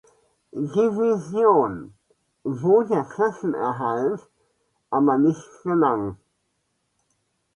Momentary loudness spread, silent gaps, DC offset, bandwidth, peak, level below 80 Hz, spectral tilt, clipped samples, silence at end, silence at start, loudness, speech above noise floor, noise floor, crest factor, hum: 13 LU; none; under 0.1%; 10.5 kHz; -4 dBFS; -62 dBFS; -8.5 dB/octave; under 0.1%; 1.4 s; 0.55 s; -22 LUFS; 52 dB; -73 dBFS; 18 dB; none